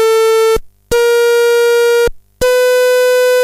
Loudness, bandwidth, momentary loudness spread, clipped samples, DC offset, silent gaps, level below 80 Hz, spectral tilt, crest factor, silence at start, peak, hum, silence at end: -11 LUFS; 16 kHz; 7 LU; under 0.1%; under 0.1%; none; -34 dBFS; -1.5 dB/octave; 6 dB; 0 s; -4 dBFS; none; 0 s